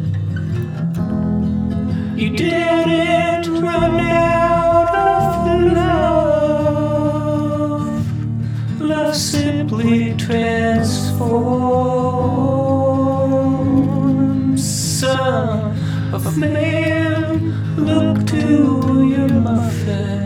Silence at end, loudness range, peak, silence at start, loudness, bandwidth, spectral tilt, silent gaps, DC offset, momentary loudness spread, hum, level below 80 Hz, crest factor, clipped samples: 0 s; 3 LU; -2 dBFS; 0 s; -17 LUFS; 16.5 kHz; -6.5 dB/octave; none; under 0.1%; 6 LU; none; -36 dBFS; 14 dB; under 0.1%